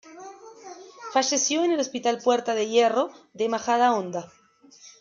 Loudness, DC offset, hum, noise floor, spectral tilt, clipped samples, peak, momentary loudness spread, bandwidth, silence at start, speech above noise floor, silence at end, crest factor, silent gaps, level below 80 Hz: -24 LUFS; under 0.1%; none; -52 dBFS; -2.5 dB/octave; under 0.1%; -8 dBFS; 22 LU; 7.6 kHz; 0.05 s; 29 dB; 0.1 s; 18 dB; none; -78 dBFS